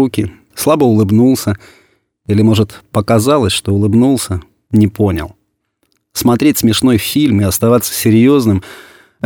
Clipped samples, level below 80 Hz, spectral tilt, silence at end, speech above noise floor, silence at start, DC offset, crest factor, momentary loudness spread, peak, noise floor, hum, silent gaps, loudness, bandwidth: under 0.1%; -40 dBFS; -5.5 dB/octave; 0.45 s; 53 dB; 0 s; under 0.1%; 12 dB; 11 LU; 0 dBFS; -64 dBFS; none; none; -12 LUFS; 19.5 kHz